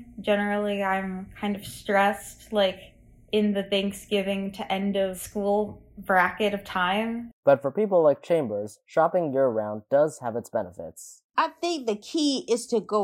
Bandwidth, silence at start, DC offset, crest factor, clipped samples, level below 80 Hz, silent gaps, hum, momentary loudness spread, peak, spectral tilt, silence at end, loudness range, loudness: 16 kHz; 0 s; under 0.1%; 20 dB; under 0.1%; -58 dBFS; 7.33-7.43 s, 11.24-11.29 s; none; 10 LU; -6 dBFS; -5 dB/octave; 0 s; 3 LU; -26 LUFS